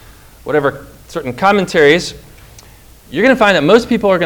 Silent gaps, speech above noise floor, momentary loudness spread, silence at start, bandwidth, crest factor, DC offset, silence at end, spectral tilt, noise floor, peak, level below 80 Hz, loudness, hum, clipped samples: none; 29 dB; 16 LU; 0.45 s; over 20 kHz; 14 dB; under 0.1%; 0 s; -5 dB/octave; -41 dBFS; 0 dBFS; -42 dBFS; -12 LUFS; none; 0.5%